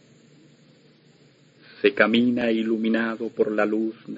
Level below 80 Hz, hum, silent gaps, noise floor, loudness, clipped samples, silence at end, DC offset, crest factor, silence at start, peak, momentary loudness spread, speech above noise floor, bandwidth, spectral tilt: -68 dBFS; none; none; -56 dBFS; -23 LUFS; under 0.1%; 0 s; under 0.1%; 24 dB; 1.8 s; -2 dBFS; 7 LU; 34 dB; 7.6 kHz; -7 dB/octave